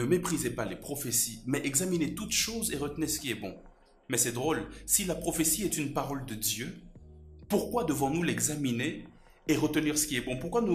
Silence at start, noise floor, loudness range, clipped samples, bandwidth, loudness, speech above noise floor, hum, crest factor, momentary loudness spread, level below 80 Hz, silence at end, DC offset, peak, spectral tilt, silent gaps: 0 s; -51 dBFS; 2 LU; under 0.1%; 15.5 kHz; -30 LUFS; 20 dB; none; 20 dB; 9 LU; -52 dBFS; 0 s; under 0.1%; -10 dBFS; -3.5 dB/octave; none